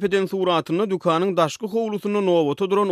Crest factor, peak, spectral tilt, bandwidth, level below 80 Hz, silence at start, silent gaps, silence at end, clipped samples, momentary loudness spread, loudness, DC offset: 16 dB; -6 dBFS; -6 dB/octave; 14.5 kHz; -66 dBFS; 0 s; none; 0 s; under 0.1%; 4 LU; -21 LUFS; under 0.1%